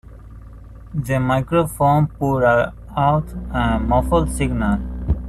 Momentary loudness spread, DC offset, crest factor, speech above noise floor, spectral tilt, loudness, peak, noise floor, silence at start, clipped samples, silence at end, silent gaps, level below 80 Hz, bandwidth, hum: 8 LU; under 0.1%; 16 dB; 20 dB; -7 dB/octave; -19 LUFS; -4 dBFS; -38 dBFS; 0.05 s; under 0.1%; 0 s; none; -28 dBFS; 14 kHz; none